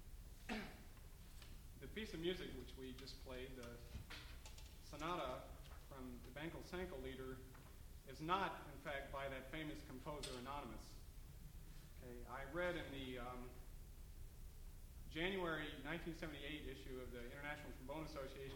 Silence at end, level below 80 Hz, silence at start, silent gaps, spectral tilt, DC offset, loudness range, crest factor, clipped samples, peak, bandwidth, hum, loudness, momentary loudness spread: 0 s; -58 dBFS; 0 s; none; -5 dB/octave; under 0.1%; 4 LU; 24 dB; under 0.1%; -28 dBFS; over 20 kHz; none; -50 LUFS; 16 LU